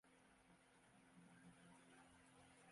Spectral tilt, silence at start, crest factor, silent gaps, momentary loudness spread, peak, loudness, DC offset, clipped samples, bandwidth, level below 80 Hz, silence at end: -4 dB/octave; 0.05 s; 14 dB; none; 2 LU; -56 dBFS; -68 LUFS; under 0.1%; under 0.1%; 11.5 kHz; -88 dBFS; 0 s